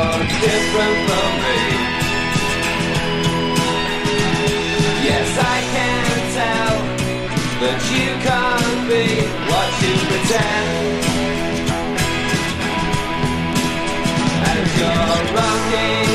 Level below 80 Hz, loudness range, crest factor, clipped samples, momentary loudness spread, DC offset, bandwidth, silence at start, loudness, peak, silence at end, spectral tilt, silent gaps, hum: -34 dBFS; 2 LU; 14 dB; under 0.1%; 4 LU; under 0.1%; 15.5 kHz; 0 s; -17 LUFS; -4 dBFS; 0 s; -4 dB/octave; none; none